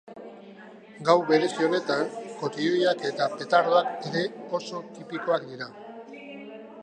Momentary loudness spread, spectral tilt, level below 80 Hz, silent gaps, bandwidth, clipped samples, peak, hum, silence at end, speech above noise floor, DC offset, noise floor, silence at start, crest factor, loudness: 22 LU; -5 dB/octave; -80 dBFS; none; 9.8 kHz; under 0.1%; -4 dBFS; none; 0 s; 21 dB; under 0.1%; -47 dBFS; 0.05 s; 22 dB; -26 LUFS